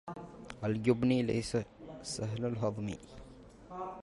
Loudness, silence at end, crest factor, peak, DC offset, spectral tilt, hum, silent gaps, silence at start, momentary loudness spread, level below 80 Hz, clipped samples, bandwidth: -34 LUFS; 0 s; 20 dB; -16 dBFS; under 0.1%; -6 dB/octave; none; none; 0.05 s; 21 LU; -58 dBFS; under 0.1%; 11.5 kHz